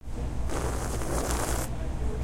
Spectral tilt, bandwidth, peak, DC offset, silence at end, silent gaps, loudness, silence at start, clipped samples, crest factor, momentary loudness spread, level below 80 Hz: -5 dB/octave; 16.5 kHz; -10 dBFS; under 0.1%; 0 s; none; -32 LUFS; 0 s; under 0.1%; 18 dB; 5 LU; -32 dBFS